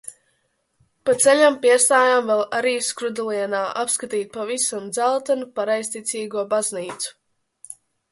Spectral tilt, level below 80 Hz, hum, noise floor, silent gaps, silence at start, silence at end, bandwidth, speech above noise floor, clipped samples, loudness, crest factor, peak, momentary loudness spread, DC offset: -1.5 dB/octave; -70 dBFS; none; -69 dBFS; none; 0.05 s; 0.4 s; 12 kHz; 49 dB; under 0.1%; -20 LUFS; 18 dB; -2 dBFS; 15 LU; under 0.1%